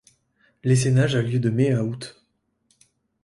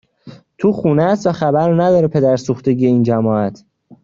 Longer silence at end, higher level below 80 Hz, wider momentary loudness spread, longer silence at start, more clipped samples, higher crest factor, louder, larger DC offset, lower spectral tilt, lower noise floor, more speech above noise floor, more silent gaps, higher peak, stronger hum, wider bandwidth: first, 1.15 s vs 0.1 s; about the same, -56 dBFS vs -52 dBFS; first, 12 LU vs 5 LU; first, 0.65 s vs 0.25 s; neither; about the same, 16 dB vs 12 dB; second, -22 LUFS vs -15 LUFS; neither; second, -6.5 dB/octave vs -8.5 dB/octave; first, -69 dBFS vs -40 dBFS; first, 48 dB vs 26 dB; neither; second, -8 dBFS vs -2 dBFS; neither; first, 11.5 kHz vs 7.6 kHz